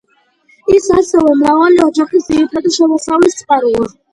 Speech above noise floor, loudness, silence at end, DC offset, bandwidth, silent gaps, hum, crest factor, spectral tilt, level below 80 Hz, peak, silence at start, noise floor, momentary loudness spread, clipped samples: 43 dB; -11 LUFS; 0.25 s; under 0.1%; 11.5 kHz; none; none; 12 dB; -4.5 dB/octave; -44 dBFS; 0 dBFS; 0.65 s; -54 dBFS; 5 LU; under 0.1%